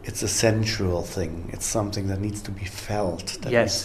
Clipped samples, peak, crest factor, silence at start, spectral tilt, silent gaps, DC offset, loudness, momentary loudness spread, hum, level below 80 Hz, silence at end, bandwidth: under 0.1%; -6 dBFS; 20 dB; 0 s; -4 dB/octave; none; under 0.1%; -26 LUFS; 10 LU; none; -42 dBFS; 0 s; 14 kHz